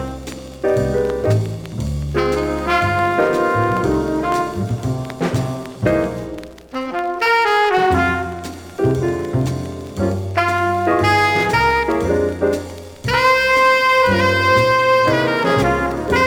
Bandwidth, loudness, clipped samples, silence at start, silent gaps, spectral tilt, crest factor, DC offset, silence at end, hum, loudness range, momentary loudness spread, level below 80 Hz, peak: over 20 kHz; -17 LUFS; under 0.1%; 0 s; none; -5.5 dB/octave; 14 dB; under 0.1%; 0 s; none; 5 LU; 12 LU; -36 dBFS; -2 dBFS